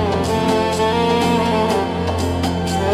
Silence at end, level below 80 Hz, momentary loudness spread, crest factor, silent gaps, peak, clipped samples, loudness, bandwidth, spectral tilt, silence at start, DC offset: 0 s; -40 dBFS; 4 LU; 14 dB; none; -4 dBFS; under 0.1%; -18 LUFS; 15 kHz; -5.5 dB/octave; 0 s; under 0.1%